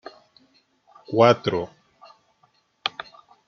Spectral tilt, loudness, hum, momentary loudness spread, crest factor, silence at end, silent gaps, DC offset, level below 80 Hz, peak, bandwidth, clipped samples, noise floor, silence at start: -4 dB/octave; -22 LUFS; none; 25 LU; 24 dB; 0.6 s; none; under 0.1%; -66 dBFS; -2 dBFS; 7 kHz; under 0.1%; -64 dBFS; 1.1 s